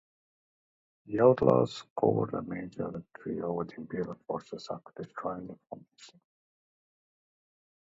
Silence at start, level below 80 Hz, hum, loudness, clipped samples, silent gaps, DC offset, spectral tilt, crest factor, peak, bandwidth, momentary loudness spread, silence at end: 1.05 s; -66 dBFS; none; -31 LUFS; under 0.1%; 1.90-1.96 s; under 0.1%; -8 dB/octave; 26 dB; -8 dBFS; 7.8 kHz; 18 LU; 1.75 s